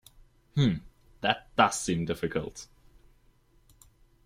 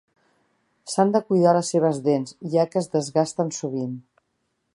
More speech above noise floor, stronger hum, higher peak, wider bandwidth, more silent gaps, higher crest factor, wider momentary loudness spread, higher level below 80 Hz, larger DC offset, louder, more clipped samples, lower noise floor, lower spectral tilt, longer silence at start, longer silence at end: second, 35 dB vs 52 dB; neither; second, -8 dBFS vs -4 dBFS; first, 16 kHz vs 11.5 kHz; neither; first, 24 dB vs 18 dB; first, 15 LU vs 11 LU; first, -56 dBFS vs -72 dBFS; neither; second, -29 LUFS vs -23 LUFS; neither; second, -63 dBFS vs -74 dBFS; second, -4.5 dB/octave vs -6 dB/octave; second, 0.55 s vs 0.85 s; first, 1.6 s vs 0.75 s